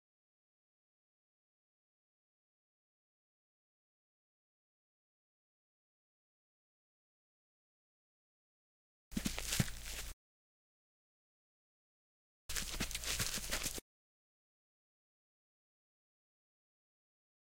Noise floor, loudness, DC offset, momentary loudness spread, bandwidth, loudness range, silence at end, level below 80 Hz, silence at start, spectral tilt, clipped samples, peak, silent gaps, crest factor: under -90 dBFS; -40 LUFS; 0.1%; 10 LU; 16.5 kHz; 6 LU; 3.75 s; -56 dBFS; 9.1 s; -2.5 dB/octave; under 0.1%; -18 dBFS; 10.13-12.49 s; 30 dB